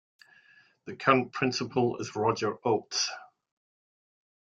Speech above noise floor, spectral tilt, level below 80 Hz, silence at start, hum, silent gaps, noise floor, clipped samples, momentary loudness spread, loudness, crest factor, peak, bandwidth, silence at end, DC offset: 32 dB; -4 dB/octave; -70 dBFS; 0.85 s; none; none; -61 dBFS; under 0.1%; 12 LU; -28 LUFS; 26 dB; -6 dBFS; 7.8 kHz; 1.3 s; under 0.1%